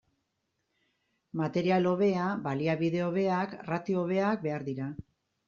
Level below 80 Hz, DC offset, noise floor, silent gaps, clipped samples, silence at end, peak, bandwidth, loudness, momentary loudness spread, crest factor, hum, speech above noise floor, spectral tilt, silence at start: -68 dBFS; under 0.1%; -80 dBFS; none; under 0.1%; 0.45 s; -14 dBFS; 7.2 kHz; -30 LUFS; 10 LU; 16 dB; none; 51 dB; -6.5 dB/octave; 1.35 s